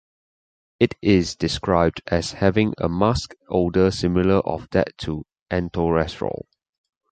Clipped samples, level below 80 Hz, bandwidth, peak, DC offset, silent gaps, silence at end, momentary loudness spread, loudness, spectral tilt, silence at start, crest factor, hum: under 0.1%; -40 dBFS; 9.2 kHz; -2 dBFS; under 0.1%; 5.42-5.46 s; 0.8 s; 9 LU; -22 LUFS; -6.5 dB/octave; 0.8 s; 20 dB; none